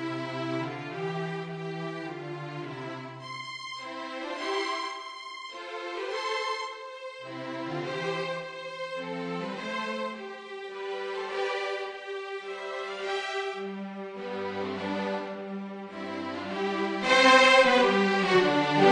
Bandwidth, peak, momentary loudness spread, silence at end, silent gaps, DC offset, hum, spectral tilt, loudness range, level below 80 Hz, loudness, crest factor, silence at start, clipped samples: 10 kHz; -6 dBFS; 16 LU; 0 s; none; under 0.1%; none; -4 dB/octave; 12 LU; -74 dBFS; -29 LUFS; 22 dB; 0 s; under 0.1%